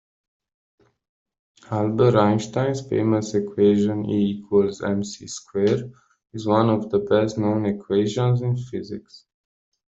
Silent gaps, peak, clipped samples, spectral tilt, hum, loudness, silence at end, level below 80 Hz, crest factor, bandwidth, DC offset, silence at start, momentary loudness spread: none; -4 dBFS; under 0.1%; -7 dB/octave; none; -22 LUFS; 0.75 s; -58 dBFS; 20 dB; 8 kHz; under 0.1%; 1.7 s; 13 LU